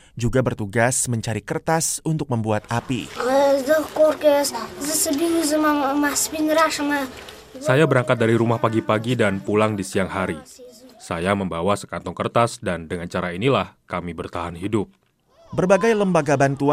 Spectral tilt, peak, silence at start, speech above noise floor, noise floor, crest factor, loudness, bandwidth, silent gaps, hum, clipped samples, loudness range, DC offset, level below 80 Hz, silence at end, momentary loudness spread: -5 dB/octave; -2 dBFS; 0.15 s; 34 dB; -54 dBFS; 20 dB; -21 LUFS; 16 kHz; none; none; under 0.1%; 5 LU; under 0.1%; -48 dBFS; 0 s; 11 LU